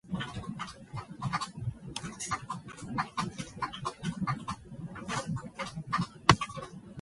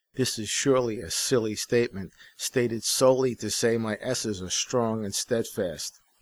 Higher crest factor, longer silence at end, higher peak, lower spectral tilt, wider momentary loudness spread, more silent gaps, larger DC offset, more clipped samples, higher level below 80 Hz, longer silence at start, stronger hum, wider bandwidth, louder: first, 32 dB vs 18 dB; second, 0 s vs 0.3 s; first, -2 dBFS vs -8 dBFS; about the same, -4.5 dB/octave vs -3.5 dB/octave; first, 14 LU vs 9 LU; neither; neither; neither; about the same, -54 dBFS vs -58 dBFS; about the same, 0.05 s vs 0.15 s; neither; second, 11.5 kHz vs over 20 kHz; second, -35 LUFS vs -26 LUFS